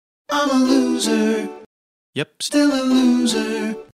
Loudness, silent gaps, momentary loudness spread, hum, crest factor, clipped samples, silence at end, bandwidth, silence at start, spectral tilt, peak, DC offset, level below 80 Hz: -18 LUFS; 1.66-2.13 s; 11 LU; none; 14 dB; under 0.1%; 0.1 s; 15 kHz; 0.3 s; -3.5 dB/octave; -4 dBFS; 0.1%; -64 dBFS